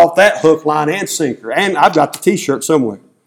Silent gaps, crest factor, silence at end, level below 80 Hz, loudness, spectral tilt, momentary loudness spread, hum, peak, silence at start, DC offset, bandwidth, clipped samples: none; 14 dB; 0.3 s; -58 dBFS; -13 LUFS; -4 dB/octave; 7 LU; none; 0 dBFS; 0 s; under 0.1%; 17.5 kHz; 0.3%